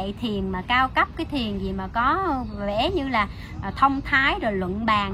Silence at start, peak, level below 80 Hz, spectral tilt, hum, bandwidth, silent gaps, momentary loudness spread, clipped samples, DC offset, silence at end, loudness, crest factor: 0 s; -4 dBFS; -38 dBFS; -6 dB/octave; none; 13.5 kHz; none; 8 LU; under 0.1%; under 0.1%; 0 s; -23 LUFS; 20 dB